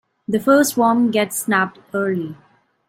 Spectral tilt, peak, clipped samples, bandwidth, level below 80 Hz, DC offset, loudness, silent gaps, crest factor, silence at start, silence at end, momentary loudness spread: -4.5 dB/octave; -4 dBFS; under 0.1%; 16.5 kHz; -64 dBFS; under 0.1%; -18 LUFS; none; 16 dB; 0.3 s; 0.55 s; 9 LU